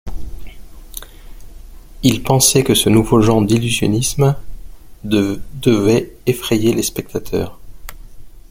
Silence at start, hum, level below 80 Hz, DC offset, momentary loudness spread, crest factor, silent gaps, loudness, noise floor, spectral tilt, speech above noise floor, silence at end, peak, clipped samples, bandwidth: 0.05 s; none; -34 dBFS; under 0.1%; 21 LU; 16 dB; none; -15 LUFS; -35 dBFS; -5 dB/octave; 20 dB; 0.1 s; 0 dBFS; under 0.1%; 17 kHz